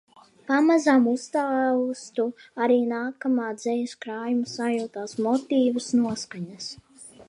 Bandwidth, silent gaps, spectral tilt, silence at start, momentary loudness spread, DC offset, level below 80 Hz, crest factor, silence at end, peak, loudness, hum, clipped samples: 11 kHz; none; -4.5 dB/octave; 0.5 s; 13 LU; under 0.1%; -72 dBFS; 16 dB; 0.05 s; -8 dBFS; -25 LUFS; none; under 0.1%